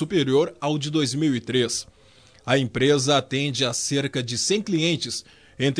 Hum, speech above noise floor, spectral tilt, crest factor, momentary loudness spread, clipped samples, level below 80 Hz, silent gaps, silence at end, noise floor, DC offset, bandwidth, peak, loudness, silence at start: none; 31 dB; -4 dB/octave; 18 dB; 6 LU; under 0.1%; -58 dBFS; none; 0 s; -54 dBFS; under 0.1%; 11 kHz; -4 dBFS; -23 LUFS; 0 s